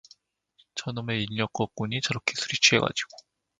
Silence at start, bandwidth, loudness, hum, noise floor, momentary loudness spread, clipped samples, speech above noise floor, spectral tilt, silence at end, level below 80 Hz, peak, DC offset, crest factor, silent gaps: 0.75 s; 10 kHz; -26 LUFS; none; -66 dBFS; 15 LU; under 0.1%; 39 dB; -3 dB/octave; 0.45 s; -62 dBFS; -4 dBFS; under 0.1%; 26 dB; none